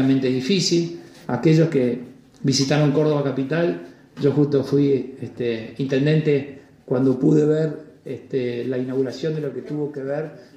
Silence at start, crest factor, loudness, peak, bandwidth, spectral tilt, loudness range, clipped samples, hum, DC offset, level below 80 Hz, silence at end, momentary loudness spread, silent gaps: 0 s; 16 dB; -21 LUFS; -6 dBFS; 11 kHz; -6.5 dB/octave; 2 LU; under 0.1%; none; under 0.1%; -62 dBFS; 0.1 s; 11 LU; none